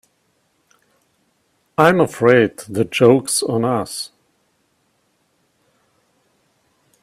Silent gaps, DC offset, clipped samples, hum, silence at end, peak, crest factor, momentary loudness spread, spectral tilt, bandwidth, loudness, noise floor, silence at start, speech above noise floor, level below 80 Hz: none; under 0.1%; under 0.1%; none; 2.95 s; 0 dBFS; 20 dB; 13 LU; -5 dB/octave; 15.5 kHz; -16 LUFS; -65 dBFS; 1.8 s; 49 dB; -60 dBFS